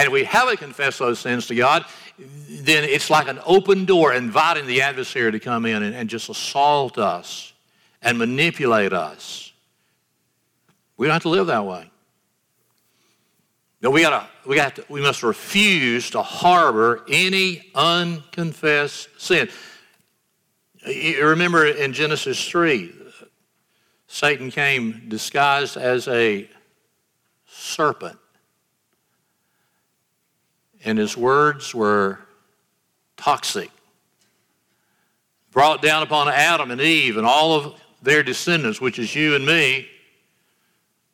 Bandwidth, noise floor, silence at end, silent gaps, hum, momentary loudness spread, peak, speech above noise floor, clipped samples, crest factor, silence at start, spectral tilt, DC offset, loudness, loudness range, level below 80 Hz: 18.5 kHz; -70 dBFS; 1.25 s; none; none; 13 LU; -4 dBFS; 51 dB; under 0.1%; 18 dB; 0 s; -4 dB/octave; under 0.1%; -19 LUFS; 8 LU; -68 dBFS